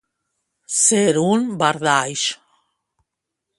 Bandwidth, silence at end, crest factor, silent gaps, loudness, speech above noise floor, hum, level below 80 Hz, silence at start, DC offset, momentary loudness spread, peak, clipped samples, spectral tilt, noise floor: 11.5 kHz; 1.25 s; 20 dB; none; -18 LUFS; 63 dB; none; -66 dBFS; 0.7 s; under 0.1%; 9 LU; 0 dBFS; under 0.1%; -3 dB/octave; -81 dBFS